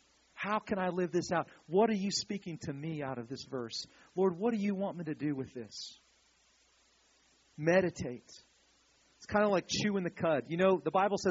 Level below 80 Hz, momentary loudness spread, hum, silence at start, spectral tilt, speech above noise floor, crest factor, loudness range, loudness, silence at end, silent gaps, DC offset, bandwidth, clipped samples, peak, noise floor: -70 dBFS; 13 LU; none; 0.35 s; -4.5 dB/octave; 36 dB; 20 dB; 5 LU; -34 LUFS; 0 s; none; under 0.1%; 7.6 kHz; under 0.1%; -14 dBFS; -69 dBFS